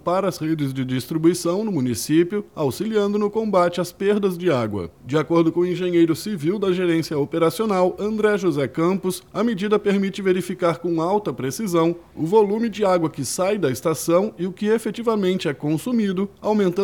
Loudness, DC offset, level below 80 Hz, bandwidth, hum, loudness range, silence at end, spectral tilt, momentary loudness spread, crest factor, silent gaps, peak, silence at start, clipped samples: -21 LUFS; under 0.1%; -58 dBFS; 18 kHz; none; 1 LU; 0 s; -6 dB/octave; 5 LU; 16 dB; none; -4 dBFS; 0.05 s; under 0.1%